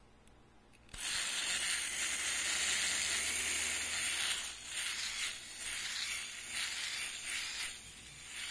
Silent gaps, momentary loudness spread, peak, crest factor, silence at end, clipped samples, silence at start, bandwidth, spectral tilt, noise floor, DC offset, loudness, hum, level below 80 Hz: none; 10 LU; -20 dBFS; 20 dB; 0 s; under 0.1%; 0 s; 11 kHz; 1.5 dB/octave; -62 dBFS; under 0.1%; -35 LUFS; none; -64 dBFS